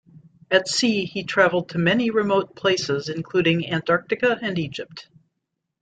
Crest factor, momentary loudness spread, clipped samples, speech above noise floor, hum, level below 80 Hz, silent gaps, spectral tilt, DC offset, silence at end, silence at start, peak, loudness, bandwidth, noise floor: 20 dB; 8 LU; under 0.1%; 58 dB; none; -62 dBFS; none; -4.5 dB/octave; under 0.1%; 0.8 s; 0.5 s; -4 dBFS; -22 LUFS; 9.4 kHz; -79 dBFS